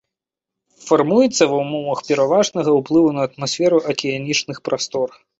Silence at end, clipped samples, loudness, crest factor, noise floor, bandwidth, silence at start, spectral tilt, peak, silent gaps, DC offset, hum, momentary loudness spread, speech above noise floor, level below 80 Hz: 0.3 s; under 0.1%; -18 LUFS; 16 dB; -84 dBFS; 8.2 kHz; 0.85 s; -4.5 dB/octave; -2 dBFS; none; under 0.1%; none; 8 LU; 67 dB; -60 dBFS